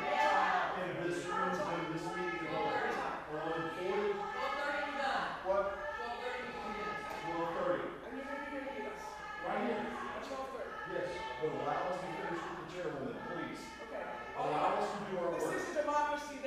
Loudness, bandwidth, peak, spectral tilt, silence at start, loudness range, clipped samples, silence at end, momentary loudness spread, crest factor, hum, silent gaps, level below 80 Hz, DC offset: -38 LUFS; 15 kHz; -18 dBFS; -4.5 dB/octave; 0 s; 4 LU; under 0.1%; 0 s; 9 LU; 18 dB; none; none; -64 dBFS; under 0.1%